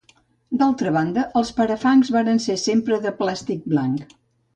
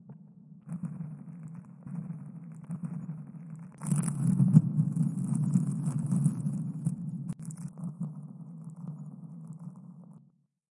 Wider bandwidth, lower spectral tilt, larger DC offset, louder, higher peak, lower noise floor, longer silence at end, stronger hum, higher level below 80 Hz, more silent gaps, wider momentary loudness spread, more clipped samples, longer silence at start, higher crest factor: second, 9.2 kHz vs 11.5 kHz; second, -5.5 dB/octave vs -8.5 dB/octave; neither; first, -21 LUFS vs -32 LUFS; about the same, -6 dBFS vs -6 dBFS; second, -58 dBFS vs -65 dBFS; about the same, 0.5 s vs 0.6 s; neither; first, -58 dBFS vs -72 dBFS; neither; second, 8 LU vs 18 LU; neither; first, 0.5 s vs 0 s; second, 14 dB vs 26 dB